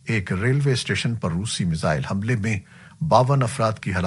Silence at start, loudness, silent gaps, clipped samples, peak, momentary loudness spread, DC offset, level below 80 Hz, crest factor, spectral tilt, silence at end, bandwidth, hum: 0.05 s; -22 LUFS; none; under 0.1%; 0 dBFS; 7 LU; under 0.1%; -48 dBFS; 22 dB; -5.5 dB/octave; 0 s; 11.5 kHz; none